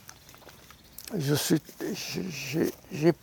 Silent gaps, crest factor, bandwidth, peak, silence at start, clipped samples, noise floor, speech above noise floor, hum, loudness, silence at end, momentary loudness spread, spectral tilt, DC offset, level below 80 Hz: none; 22 dB; 19.5 kHz; -8 dBFS; 0.1 s; under 0.1%; -52 dBFS; 23 dB; none; -30 LUFS; 0.05 s; 23 LU; -5 dB/octave; under 0.1%; -64 dBFS